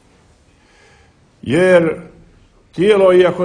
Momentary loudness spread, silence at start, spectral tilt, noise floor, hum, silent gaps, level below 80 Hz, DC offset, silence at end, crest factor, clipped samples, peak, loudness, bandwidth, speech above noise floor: 20 LU; 1.45 s; -6.5 dB/octave; -51 dBFS; none; none; -50 dBFS; under 0.1%; 0 s; 16 dB; under 0.1%; 0 dBFS; -13 LUFS; 10 kHz; 39 dB